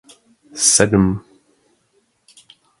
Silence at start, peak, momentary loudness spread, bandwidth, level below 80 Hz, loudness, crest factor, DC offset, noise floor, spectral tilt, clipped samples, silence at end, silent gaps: 0.55 s; 0 dBFS; 18 LU; 11.5 kHz; -42 dBFS; -14 LUFS; 20 dB; under 0.1%; -63 dBFS; -3.5 dB/octave; under 0.1%; 1.6 s; none